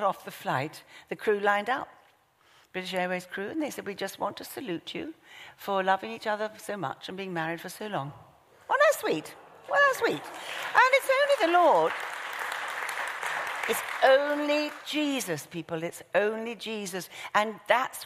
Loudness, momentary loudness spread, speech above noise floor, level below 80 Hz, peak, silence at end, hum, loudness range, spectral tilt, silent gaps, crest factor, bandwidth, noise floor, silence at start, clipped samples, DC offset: -28 LUFS; 15 LU; 35 dB; -76 dBFS; -8 dBFS; 0 s; none; 8 LU; -3.5 dB/octave; none; 22 dB; 15.5 kHz; -63 dBFS; 0 s; under 0.1%; under 0.1%